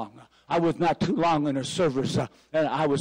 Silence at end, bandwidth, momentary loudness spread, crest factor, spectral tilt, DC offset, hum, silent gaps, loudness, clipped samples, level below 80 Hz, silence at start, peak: 0 s; 15.5 kHz; 6 LU; 10 dB; -6 dB/octave; under 0.1%; none; none; -26 LUFS; under 0.1%; -56 dBFS; 0 s; -16 dBFS